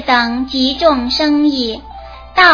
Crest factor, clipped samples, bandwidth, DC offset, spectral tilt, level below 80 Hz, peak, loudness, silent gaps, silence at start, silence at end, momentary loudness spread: 14 dB; under 0.1%; 5.4 kHz; under 0.1%; -4 dB/octave; -38 dBFS; 0 dBFS; -14 LUFS; none; 0 s; 0 s; 15 LU